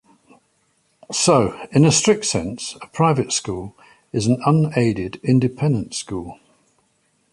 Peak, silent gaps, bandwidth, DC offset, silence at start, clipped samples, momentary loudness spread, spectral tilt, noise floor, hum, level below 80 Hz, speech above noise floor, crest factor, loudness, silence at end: -2 dBFS; none; 11.5 kHz; under 0.1%; 1.1 s; under 0.1%; 14 LU; -5 dB/octave; -65 dBFS; none; -50 dBFS; 46 dB; 18 dB; -19 LUFS; 1 s